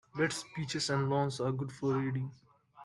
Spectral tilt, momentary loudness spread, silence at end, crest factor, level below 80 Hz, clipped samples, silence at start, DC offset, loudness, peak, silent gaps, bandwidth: -5 dB/octave; 7 LU; 0 s; 16 dB; -70 dBFS; under 0.1%; 0.15 s; under 0.1%; -34 LUFS; -18 dBFS; none; 12 kHz